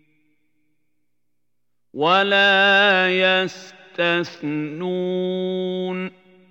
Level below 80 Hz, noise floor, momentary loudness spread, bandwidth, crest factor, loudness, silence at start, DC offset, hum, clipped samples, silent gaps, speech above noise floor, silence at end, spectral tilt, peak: -82 dBFS; -80 dBFS; 15 LU; 8 kHz; 18 dB; -19 LUFS; 1.95 s; under 0.1%; 60 Hz at -55 dBFS; under 0.1%; none; 61 dB; 0.4 s; -5 dB/octave; -4 dBFS